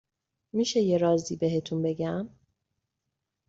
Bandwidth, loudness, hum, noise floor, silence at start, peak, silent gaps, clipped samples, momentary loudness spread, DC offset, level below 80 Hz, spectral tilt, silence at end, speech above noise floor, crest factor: 8 kHz; -28 LUFS; none; -84 dBFS; 0.55 s; -12 dBFS; none; under 0.1%; 10 LU; under 0.1%; -66 dBFS; -6 dB/octave; 1.2 s; 57 dB; 16 dB